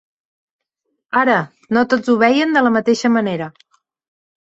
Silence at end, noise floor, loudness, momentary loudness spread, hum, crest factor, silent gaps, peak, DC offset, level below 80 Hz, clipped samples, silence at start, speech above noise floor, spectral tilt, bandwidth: 0.9 s; -74 dBFS; -16 LUFS; 8 LU; none; 16 dB; none; -2 dBFS; under 0.1%; -62 dBFS; under 0.1%; 1.15 s; 59 dB; -5.5 dB/octave; 7.8 kHz